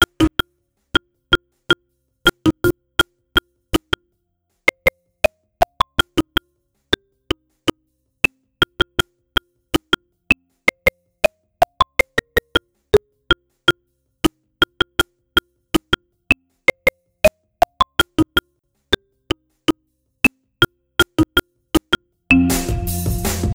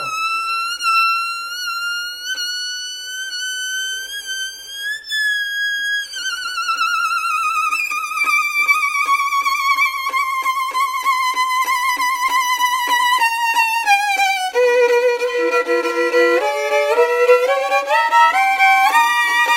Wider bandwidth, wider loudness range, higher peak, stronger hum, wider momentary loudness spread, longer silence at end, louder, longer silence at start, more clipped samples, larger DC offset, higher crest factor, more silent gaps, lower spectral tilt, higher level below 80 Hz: first, over 20 kHz vs 16 kHz; second, 3 LU vs 7 LU; about the same, 0 dBFS vs 0 dBFS; neither; second, 6 LU vs 9 LU; about the same, 0 s vs 0 s; second, -20 LUFS vs -16 LUFS; about the same, 0 s vs 0 s; neither; neither; about the same, 20 dB vs 16 dB; neither; first, -4 dB/octave vs 1 dB/octave; first, -36 dBFS vs -62 dBFS